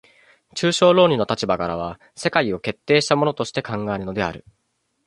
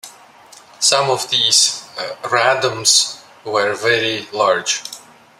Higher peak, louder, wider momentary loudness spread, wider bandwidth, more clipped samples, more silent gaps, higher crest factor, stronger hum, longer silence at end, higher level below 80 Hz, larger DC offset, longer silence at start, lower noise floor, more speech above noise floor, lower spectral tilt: about the same, -2 dBFS vs 0 dBFS; second, -20 LUFS vs -15 LUFS; about the same, 12 LU vs 14 LU; second, 11.5 kHz vs 16 kHz; neither; neither; about the same, 20 dB vs 18 dB; neither; first, 0.7 s vs 0.4 s; first, -52 dBFS vs -68 dBFS; neither; first, 0.55 s vs 0.05 s; first, -54 dBFS vs -44 dBFS; first, 34 dB vs 27 dB; first, -5 dB/octave vs -0.5 dB/octave